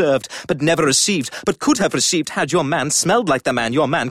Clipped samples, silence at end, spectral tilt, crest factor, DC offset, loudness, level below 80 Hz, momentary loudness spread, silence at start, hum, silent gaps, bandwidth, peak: under 0.1%; 0 s; -3.5 dB/octave; 14 dB; 0.1%; -17 LUFS; -52 dBFS; 6 LU; 0 s; none; none; 15.5 kHz; -4 dBFS